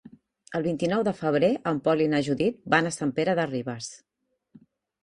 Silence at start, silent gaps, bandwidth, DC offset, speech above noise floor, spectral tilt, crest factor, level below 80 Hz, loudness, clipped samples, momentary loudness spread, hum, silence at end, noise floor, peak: 0.05 s; none; 11.5 kHz; under 0.1%; 33 dB; -5.5 dB/octave; 22 dB; -64 dBFS; -26 LUFS; under 0.1%; 10 LU; none; 1.05 s; -58 dBFS; -6 dBFS